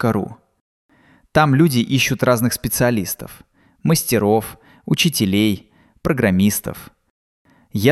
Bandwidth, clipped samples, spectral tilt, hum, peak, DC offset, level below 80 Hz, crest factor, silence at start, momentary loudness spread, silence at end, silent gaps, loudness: 16 kHz; under 0.1%; -5 dB/octave; none; -2 dBFS; under 0.1%; -46 dBFS; 18 dB; 0 s; 14 LU; 0 s; 0.61-0.89 s, 7.10-7.45 s; -18 LUFS